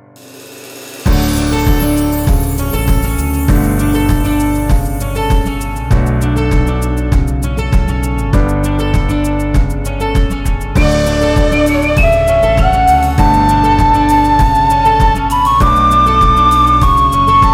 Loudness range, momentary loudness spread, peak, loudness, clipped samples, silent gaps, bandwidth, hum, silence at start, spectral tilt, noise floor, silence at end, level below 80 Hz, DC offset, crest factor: 5 LU; 7 LU; 0 dBFS; -12 LUFS; under 0.1%; none; 19.5 kHz; none; 0.25 s; -6 dB/octave; -36 dBFS; 0 s; -16 dBFS; under 0.1%; 10 dB